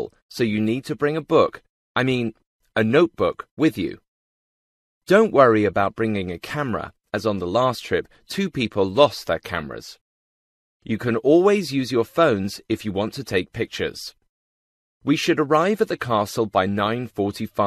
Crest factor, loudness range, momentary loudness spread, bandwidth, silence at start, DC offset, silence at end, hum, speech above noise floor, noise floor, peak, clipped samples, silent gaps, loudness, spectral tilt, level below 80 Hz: 20 dB; 4 LU; 12 LU; 14 kHz; 0 s; under 0.1%; 0 s; none; over 69 dB; under -90 dBFS; -2 dBFS; under 0.1%; 0.22-0.29 s, 1.69-1.95 s, 2.46-2.59 s, 3.51-3.57 s, 4.08-5.01 s, 10.01-10.80 s, 14.29-15.01 s; -22 LUFS; -6 dB/octave; -56 dBFS